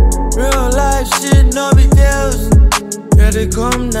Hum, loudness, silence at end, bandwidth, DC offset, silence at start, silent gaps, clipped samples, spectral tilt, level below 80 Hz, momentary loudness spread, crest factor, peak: none; -12 LUFS; 0 s; 16 kHz; 0.1%; 0 s; none; under 0.1%; -5 dB/octave; -12 dBFS; 6 LU; 10 dB; 0 dBFS